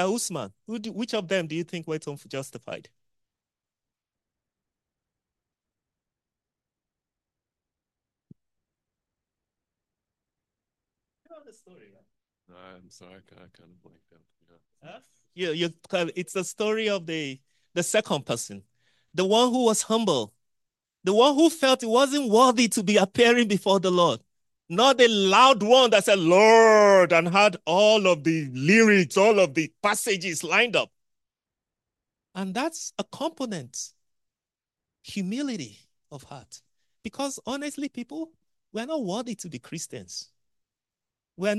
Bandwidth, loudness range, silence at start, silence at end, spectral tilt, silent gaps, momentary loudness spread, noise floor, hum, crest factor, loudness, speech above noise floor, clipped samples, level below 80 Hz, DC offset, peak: 12.5 kHz; 18 LU; 0 s; 0 s; -3.5 dB/octave; none; 19 LU; under -90 dBFS; none; 22 dB; -22 LUFS; over 67 dB; under 0.1%; -72 dBFS; under 0.1%; -2 dBFS